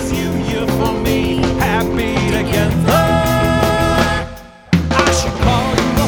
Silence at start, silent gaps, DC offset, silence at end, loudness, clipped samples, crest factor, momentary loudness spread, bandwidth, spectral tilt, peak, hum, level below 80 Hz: 0 s; none; under 0.1%; 0 s; -15 LUFS; under 0.1%; 14 dB; 5 LU; over 20 kHz; -5.5 dB/octave; 0 dBFS; none; -26 dBFS